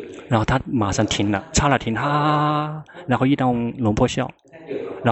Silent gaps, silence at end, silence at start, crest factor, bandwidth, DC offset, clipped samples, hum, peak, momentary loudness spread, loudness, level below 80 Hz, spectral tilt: none; 0 s; 0 s; 18 dB; 8.4 kHz; under 0.1%; under 0.1%; none; -2 dBFS; 11 LU; -21 LUFS; -38 dBFS; -5.5 dB/octave